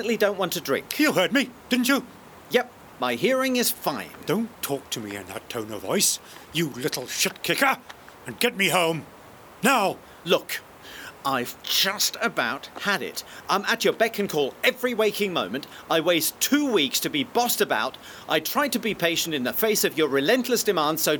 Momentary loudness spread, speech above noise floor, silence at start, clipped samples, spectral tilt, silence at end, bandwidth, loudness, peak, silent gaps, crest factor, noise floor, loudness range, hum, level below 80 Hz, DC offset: 12 LU; 22 dB; 0 s; under 0.1%; -2.5 dB/octave; 0 s; over 20 kHz; -24 LUFS; -6 dBFS; none; 20 dB; -47 dBFS; 3 LU; none; -64 dBFS; under 0.1%